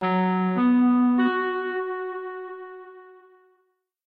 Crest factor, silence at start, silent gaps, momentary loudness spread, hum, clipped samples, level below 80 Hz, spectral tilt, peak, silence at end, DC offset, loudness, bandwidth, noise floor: 12 dB; 0 s; none; 19 LU; none; under 0.1%; -76 dBFS; -10 dB/octave; -12 dBFS; 0.95 s; under 0.1%; -23 LUFS; 4.5 kHz; -71 dBFS